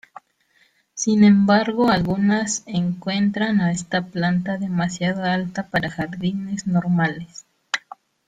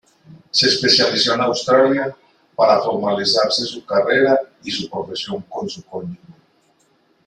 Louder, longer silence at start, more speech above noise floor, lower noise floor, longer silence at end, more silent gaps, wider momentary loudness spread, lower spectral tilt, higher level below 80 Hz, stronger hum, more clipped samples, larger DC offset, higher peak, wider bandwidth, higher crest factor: second, -21 LUFS vs -17 LUFS; first, 0.95 s vs 0.3 s; about the same, 41 dB vs 42 dB; about the same, -61 dBFS vs -60 dBFS; second, 0.5 s vs 1.1 s; neither; second, 11 LU vs 15 LU; first, -5.5 dB/octave vs -3.5 dB/octave; first, -54 dBFS vs -62 dBFS; neither; neither; neither; second, -4 dBFS vs 0 dBFS; second, 9.2 kHz vs 11.5 kHz; about the same, 16 dB vs 18 dB